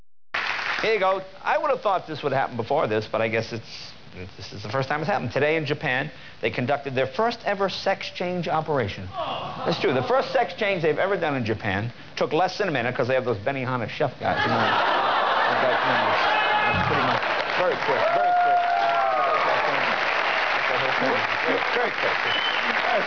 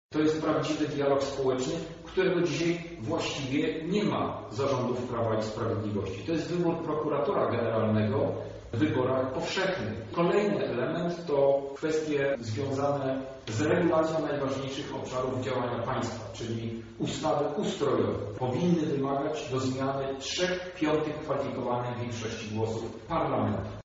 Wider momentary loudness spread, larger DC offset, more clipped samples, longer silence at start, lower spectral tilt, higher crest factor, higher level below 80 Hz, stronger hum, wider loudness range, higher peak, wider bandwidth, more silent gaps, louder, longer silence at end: about the same, 8 LU vs 7 LU; first, 0.5% vs under 0.1%; neither; first, 0.35 s vs 0.1 s; about the same, -5.5 dB/octave vs -5.5 dB/octave; about the same, 14 dB vs 16 dB; about the same, -58 dBFS vs -56 dBFS; neither; about the same, 5 LU vs 3 LU; first, -10 dBFS vs -14 dBFS; second, 5.4 kHz vs 8 kHz; neither; first, -23 LUFS vs -30 LUFS; about the same, 0 s vs 0.05 s